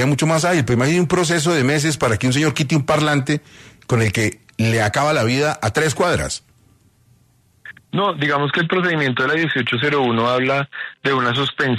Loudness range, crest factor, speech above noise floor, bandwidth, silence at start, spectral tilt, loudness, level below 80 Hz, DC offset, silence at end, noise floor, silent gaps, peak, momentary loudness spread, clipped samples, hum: 4 LU; 14 dB; 39 dB; 14 kHz; 0 s; -5 dB/octave; -18 LUFS; -48 dBFS; under 0.1%; 0 s; -57 dBFS; none; -4 dBFS; 5 LU; under 0.1%; none